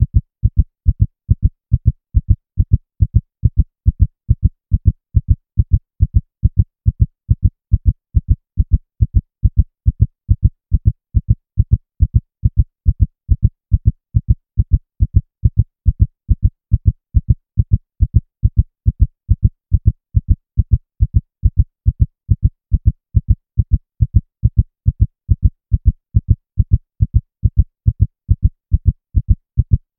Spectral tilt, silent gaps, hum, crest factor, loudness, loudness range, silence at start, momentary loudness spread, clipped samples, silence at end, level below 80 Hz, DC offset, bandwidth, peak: -18 dB/octave; none; none; 14 dB; -18 LUFS; 0 LU; 0 s; 2 LU; under 0.1%; 0.2 s; -18 dBFS; 0.5%; 0.6 kHz; 0 dBFS